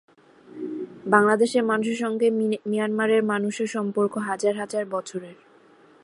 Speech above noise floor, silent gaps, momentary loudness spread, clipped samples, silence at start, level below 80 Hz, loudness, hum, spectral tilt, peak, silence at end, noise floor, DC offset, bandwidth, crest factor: 31 dB; none; 14 LU; under 0.1%; 0.5 s; -76 dBFS; -24 LUFS; none; -5 dB/octave; -2 dBFS; 0.7 s; -54 dBFS; under 0.1%; 11.5 kHz; 22 dB